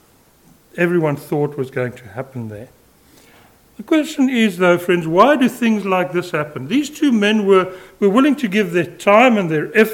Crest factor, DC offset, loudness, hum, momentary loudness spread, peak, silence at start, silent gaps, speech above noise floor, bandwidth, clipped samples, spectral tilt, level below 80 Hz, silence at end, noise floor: 16 dB; under 0.1%; -16 LUFS; none; 14 LU; 0 dBFS; 0.75 s; none; 36 dB; 17 kHz; under 0.1%; -6 dB/octave; -58 dBFS; 0 s; -52 dBFS